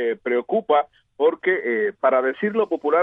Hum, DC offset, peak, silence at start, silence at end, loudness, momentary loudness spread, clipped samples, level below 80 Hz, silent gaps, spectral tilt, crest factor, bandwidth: none; under 0.1%; -6 dBFS; 0 s; 0 s; -21 LUFS; 3 LU; under 0.1%; -72 dBFS; none; -8 dB/octave; 16 dB; 3.9 kHz